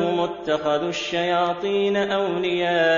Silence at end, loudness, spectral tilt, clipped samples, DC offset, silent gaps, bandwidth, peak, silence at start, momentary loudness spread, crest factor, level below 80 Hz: 0 s; -22 LUFS; -5 dB/octave; under 0.1%; under 0.1%; none; 7.4 kHz; -8 dBFS; 0 s; 3 LU; 14 dB; -60 dBFS